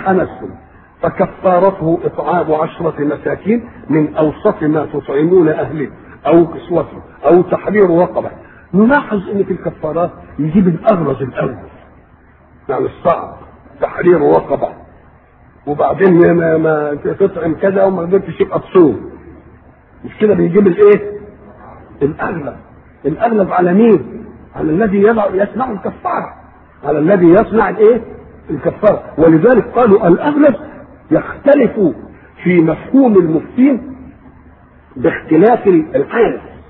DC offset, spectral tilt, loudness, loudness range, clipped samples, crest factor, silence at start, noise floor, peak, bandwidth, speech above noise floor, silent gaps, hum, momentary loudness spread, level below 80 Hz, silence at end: under 0.1%; -12 dB/octave; -13 LUFS; 5 LU; under 0.1%; 12 dB; 0 s; -45 dBFS; 0 dBFS; 4.2 kHz; 33 dB; none; none; 13 LU; -44 dBFS; 0.1 s